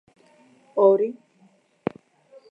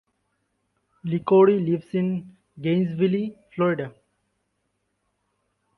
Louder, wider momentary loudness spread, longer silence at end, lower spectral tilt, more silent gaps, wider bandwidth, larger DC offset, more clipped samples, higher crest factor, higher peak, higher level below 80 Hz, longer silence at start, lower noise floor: about the same, -23 LUFS vs -23 LUFS; about the same, 15 LU vs 15 LU; second, 1.4 s vs 1.9 s; about the same, -9 dB/octave vs -10 dB/octave; neither; first, 4.9 kHz vs 4.4 kHz; neither; neither; about the same, 20 dB vs 18 dB; about the same, -6 dBFS vs -6 dBFS; second, -74 dBFS vs -66 dBFS; second, 0.75 s vs 1.05 s; second, -60 dBFS vs -75 dBFS